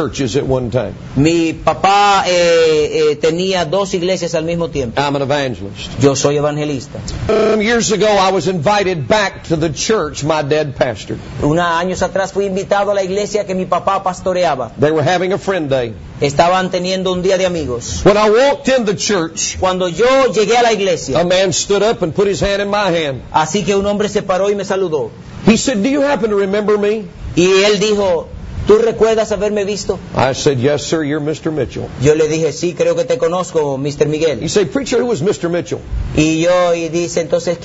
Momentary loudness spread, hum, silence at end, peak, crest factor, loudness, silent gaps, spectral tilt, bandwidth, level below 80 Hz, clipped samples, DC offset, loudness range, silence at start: 7 LU; none; 0 s; 0 dBFS; 14 dB; -14 LUFS; none; -4.5 dB/octave; 8 kHz; -36 dBFS; under 0.1%; under 0.1%; 3 LU; 0 s